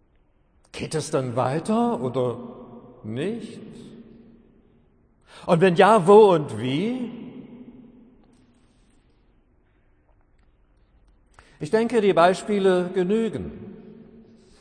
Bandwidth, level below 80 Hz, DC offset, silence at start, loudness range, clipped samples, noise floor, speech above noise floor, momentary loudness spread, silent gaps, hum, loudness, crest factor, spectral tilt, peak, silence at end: 10.5 kHz; -58 dBFS; under 0.1%; 0.75 s; 14 LU; under 0.1%; -61 dBFS; 41 dB; 25 LU; none; none; -21 LUFS; 20 dB; -6.5 dB/octave; -4 dBFS; 0.6 s